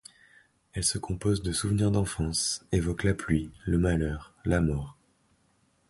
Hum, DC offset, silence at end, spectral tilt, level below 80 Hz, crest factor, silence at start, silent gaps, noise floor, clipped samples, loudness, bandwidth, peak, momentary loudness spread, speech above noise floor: none; under 0.1%; 1 s; -5 dB/octave; -40 dBFS; 18 dB; 0.75 s; none; -68 dBFS; under 0.1%; -28 LUFS; 11.5 kHz; -12 dBFS; 6 LU; 40 dB